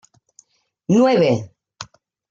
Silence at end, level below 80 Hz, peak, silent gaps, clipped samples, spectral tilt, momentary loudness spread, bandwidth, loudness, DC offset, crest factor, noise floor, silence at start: 0.5 s; -62 dBFS; -4 dBFS; none; under 0.1%; -6.5 dB/octave; 23 LU; 7.6 kHz; -17 LUFS; under 0.1%; 16 dB; -55 dBFS; 0.9 s